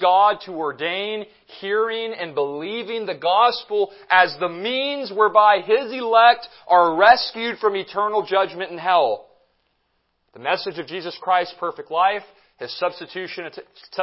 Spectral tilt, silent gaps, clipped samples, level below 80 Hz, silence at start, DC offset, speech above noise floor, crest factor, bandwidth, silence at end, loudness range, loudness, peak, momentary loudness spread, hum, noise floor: -7 dB/octave; none; under 0.1%; -70 dBFS; 0 s; under 0.1%; 50 dB; 20 dB; 5.8 kHz; 0 s; 8 LU; -20 LUFS; 0 dBFS; 16 LU; none; -70 dBFS